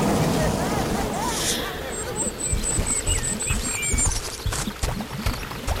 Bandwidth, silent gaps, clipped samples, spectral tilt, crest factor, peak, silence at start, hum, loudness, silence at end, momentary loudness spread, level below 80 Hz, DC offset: 16 kHz; none; under 0.1%; -3.5 dB/octave; 16 dB; -8 dBFS; 0 s; none; -24 LUFS; 0 s; 7 LU; -32 dBFS; under 0.1%